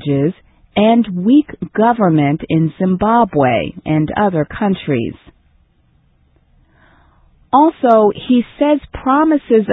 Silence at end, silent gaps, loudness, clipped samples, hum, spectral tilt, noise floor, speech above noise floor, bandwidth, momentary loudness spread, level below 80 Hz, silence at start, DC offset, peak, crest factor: 0 s; none; -14 LUFS; under 0.1%; none; -10.5 dB/octave; -55 dBFS; 42 dB; 4 kHz; 6 LU; -44 dBFS; 0 s; under 0.1%; 0 dBFS; 14 dB